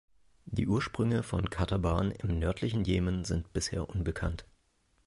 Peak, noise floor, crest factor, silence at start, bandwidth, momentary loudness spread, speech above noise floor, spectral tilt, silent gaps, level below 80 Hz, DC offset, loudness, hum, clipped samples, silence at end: -16 dBFS; -72 dBFS; 16 dB; 0.45 s; 11.5 kHz; 5 LU; 41 dB; -6 dB/octave; none; -42 dBFS; under 0.1%; -32 LUFS; none; under 0.1%; 0.6 s